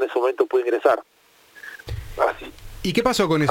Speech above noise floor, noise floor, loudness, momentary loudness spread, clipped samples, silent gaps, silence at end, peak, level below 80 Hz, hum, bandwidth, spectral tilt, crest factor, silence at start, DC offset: 23 dB; -44 dBFS; -21 LUFS; 18 LU; under 0.1%; none; 0 s; -4 dBFS; -44 dBFS; none; 17 kHz; -5 dB/octave; 20 dB; 0 s; under 0.1%